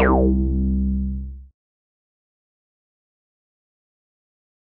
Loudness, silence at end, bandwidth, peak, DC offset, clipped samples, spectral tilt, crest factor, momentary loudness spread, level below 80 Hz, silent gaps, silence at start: -21 LUFS; 3.35 s; 3 kHz; -4 dBFS; under 0.1%; under 0.1%; -13 dB/octave; 22 dB; 14 LU; -28 dBFS; none; 0 s